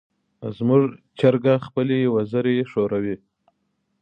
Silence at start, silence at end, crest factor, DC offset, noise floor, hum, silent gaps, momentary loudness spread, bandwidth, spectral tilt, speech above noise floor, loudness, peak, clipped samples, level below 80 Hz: 0.4 s; 0.85 s; 18 dB; under 0.1%; -72 dBFS; none; none; 11 LU; 5.4 kHz; -9.5 dB/octave; 52 dB; -21 LUFS; -4 dBFS; under 0.1%; -62 dBFS